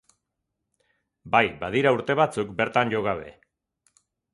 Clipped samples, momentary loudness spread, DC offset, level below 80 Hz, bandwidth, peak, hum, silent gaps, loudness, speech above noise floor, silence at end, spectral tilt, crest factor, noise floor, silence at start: under 0.1%; 7 LU; under 0.1%; -58 dBFS; 11.5 kHz; -4 dBFS; none; none; -24 LUFS; 58 dB; 1.05 s; -6 dB/octave; 24 dB; -81 dBFS; 1.25 s